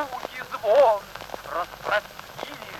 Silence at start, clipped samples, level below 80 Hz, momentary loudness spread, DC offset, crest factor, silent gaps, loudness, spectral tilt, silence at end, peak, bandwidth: 0 s; under 0.1%; -58 dBFS; 18 LU; under 0.1%; 18 dB; none; -24 LUFS; -3 dB/octave; 0 s; -8 dBFS; 16 kHz